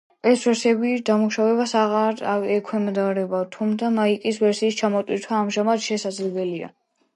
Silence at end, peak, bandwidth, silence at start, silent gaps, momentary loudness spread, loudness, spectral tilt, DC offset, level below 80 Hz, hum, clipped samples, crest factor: 0.5 s; -6 dBFS; 11.5 kHz; 0.25 s; none; 6 LU; -22 LUFS; -5 dB/octave; under 0.1%; -74 dBFS; none; under 0.1%; 16 dB